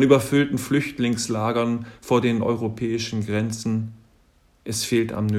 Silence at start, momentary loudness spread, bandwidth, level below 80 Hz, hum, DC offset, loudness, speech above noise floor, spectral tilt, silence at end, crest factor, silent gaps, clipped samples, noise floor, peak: 0 s; 7 LU; 16 kHz; -56 dBFS; none; under 0.1%; -23 LUFS; 37 dB; -5.5 dB/octave; 0 s; 22 dB; none; under 0.1%; -59 dBFS; -2 dBFS